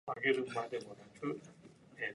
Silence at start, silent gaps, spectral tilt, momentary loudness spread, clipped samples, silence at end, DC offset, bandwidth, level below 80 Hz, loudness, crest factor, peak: 0.05 s; none; -5 dB/octave; 21 LU; under 0.1%; 0 s; under 0.1%; 11.5 kHz; -80 dBFS; -39 LUFS; 20 dB; -20 dBFS